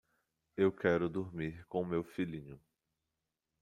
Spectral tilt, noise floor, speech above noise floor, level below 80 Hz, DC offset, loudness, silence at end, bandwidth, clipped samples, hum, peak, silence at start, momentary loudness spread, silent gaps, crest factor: -8 dB/octave; -89 dBFS; 53 dB; -68 dBFS; under 0.1%; -36 LUFS; 1.05 s; 11 kHz; under 0.1%; none; -16 dBFS; 0.55 s; 15 LU; none; 22 dB